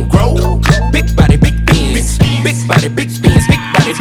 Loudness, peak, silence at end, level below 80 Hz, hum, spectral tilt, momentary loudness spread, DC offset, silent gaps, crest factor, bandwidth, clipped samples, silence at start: -11 LUFS; 0 dBFS; 0 s; -16 dBFS; none; -5.5 dB/octave; 4 LU; under 0.1%; none; 10 dB; 15 kHz; under 0.1%; 0 s